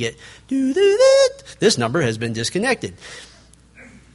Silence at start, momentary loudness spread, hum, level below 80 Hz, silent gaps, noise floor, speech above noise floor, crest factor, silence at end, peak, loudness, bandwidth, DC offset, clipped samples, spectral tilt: 0 s; 19 LU; none; -52 dBFS; none; -47 dBFS; 29 dB; 16 dB; 0.9 s; -4 dBFS; -18 LUFS; 11.5 kHz; under 0.1%; under 0.1%; -4 dB/octave